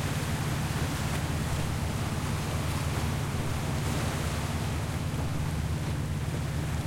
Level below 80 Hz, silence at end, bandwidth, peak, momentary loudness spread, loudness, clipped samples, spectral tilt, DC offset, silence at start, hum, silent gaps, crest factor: -40 dBFS; 0 s; 16.5 kHz; -18 dBFS; 2 LU; -31 LUFS; under 0.1%; -5.5 dB/octave; under 0.1%; 0 s; none; none; 12 dB